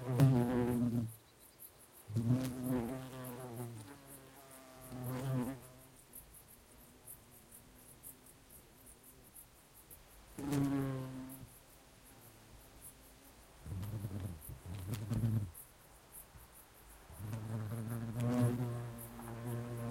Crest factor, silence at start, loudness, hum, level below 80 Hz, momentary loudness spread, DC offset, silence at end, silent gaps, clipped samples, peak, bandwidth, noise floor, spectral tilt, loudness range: 26 dB; 0 s; -39 LUFS; none; -62 dBFS; 23 LU; under 0.1%; 0 s; none; under 0.1%; -16 dBFS; 16.5 kHz; -61 dBFS; -7 dB/octave; 15 LU